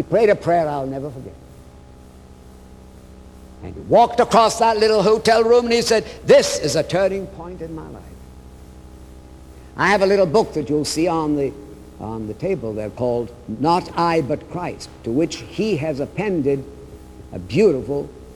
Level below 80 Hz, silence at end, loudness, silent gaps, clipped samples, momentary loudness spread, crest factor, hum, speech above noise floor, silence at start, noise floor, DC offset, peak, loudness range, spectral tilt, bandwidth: -44 dBFS; 0 s; -19 LUFS; none; under 0.1%; 20 LU; 18 dB; none; 24 dB; 0 s; -43 dBFS; under 0.1%; -2 dBFS; 9 LU; -5 dB/octave; 14 kHz